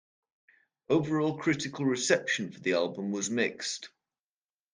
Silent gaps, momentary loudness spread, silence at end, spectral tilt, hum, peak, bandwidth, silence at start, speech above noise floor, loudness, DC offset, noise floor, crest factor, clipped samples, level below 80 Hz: none; 8 LU; 0.85 s; -4 dB/octave; none; -8 dBFS; 10 kHz; 0.9 s; over 60 dB; -30 LUFS; under 0.1%; under -90 dBFS; 22 dB; under 0.1%; -72 dBFS